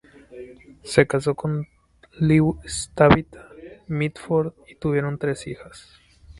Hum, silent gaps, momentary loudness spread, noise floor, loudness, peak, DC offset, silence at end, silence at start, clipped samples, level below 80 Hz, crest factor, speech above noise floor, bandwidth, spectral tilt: none; none; 24 LU; -42 dBFS; -22 LUFS; 0 dBFS; under 0.1%; 0.6 s; 0.3 s; under 0.1%; -46 dBFS; 22 dB; 20 dB; 11.5 kHz; -6.5 dB/octave